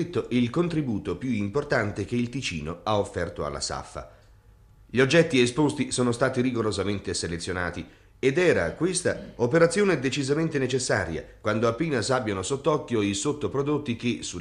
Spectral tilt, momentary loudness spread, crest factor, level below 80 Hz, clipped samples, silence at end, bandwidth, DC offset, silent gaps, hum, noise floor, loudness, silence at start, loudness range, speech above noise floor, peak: -5 dB/octave; 9 LU; 18 dB; -52 dBFS; under 0.1%; 0 s; 11.5 kHz; under 0.1%; none; none; -54 dBFS; -26 LUFS; 0 s; 4 LU; 28 dB; -8 dBFS